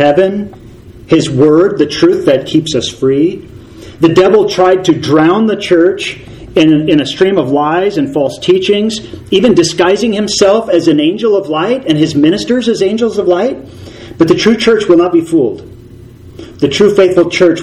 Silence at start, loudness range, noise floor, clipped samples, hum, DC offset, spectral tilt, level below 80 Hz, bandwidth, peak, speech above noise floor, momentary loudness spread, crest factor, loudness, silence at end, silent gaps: 0 s; 2 LU; -33 dBFS; 0.8%; none; under 0.1%; -5.5 dB/octave; -42 dBFS; 12 kHz; 0 dBFS; 24 dB; 8 LU; 10 dB; -10 LUFS; 0 s; none